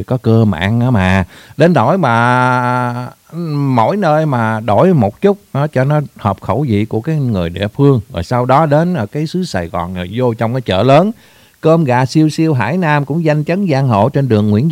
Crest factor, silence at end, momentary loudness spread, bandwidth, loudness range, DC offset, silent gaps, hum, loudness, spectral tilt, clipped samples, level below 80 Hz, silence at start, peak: 12 dB; 0 s; 8 LU; 15.5 kHz; 2 LU; under 0.1%; none; none; -13 LUFS; -7.5 dB/octave; under 0.1%; -44 dBFS; 0 s; 0 dBFS